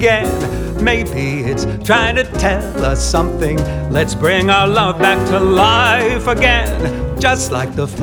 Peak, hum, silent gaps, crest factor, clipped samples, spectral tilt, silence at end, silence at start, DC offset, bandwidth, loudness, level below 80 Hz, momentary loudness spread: 0 dBFS; none; none; 14 dB; under 0.1%; -4.5 dB/octave; 0 s; 0 s; under 0.1%; over 20 kHz; -14 LUFS; -24 dBFS; 8 LU